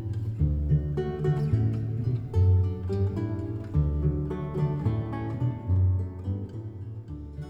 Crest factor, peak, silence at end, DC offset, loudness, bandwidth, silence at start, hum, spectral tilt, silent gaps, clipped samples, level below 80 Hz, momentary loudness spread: 14 dB; -12 dBFS; 0 s; under 0.1%; -28 LUFS; 5.4 kHz; 0 s; none; -10.5 dB/octave; none; under 0.1%; -36 dBFS; 9 LU